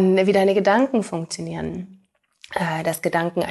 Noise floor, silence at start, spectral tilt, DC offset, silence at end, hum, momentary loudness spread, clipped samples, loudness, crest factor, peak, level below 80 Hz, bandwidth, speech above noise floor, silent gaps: -52 dBFS; 0 s; -5.5 dB/octave; under 0.1%; 0 s; none; 14 LU; under 0.1%; -21 LUFS; 16 dB; -4 dBFS; -56 dBFS; 12.5 kHz; 31 dB; none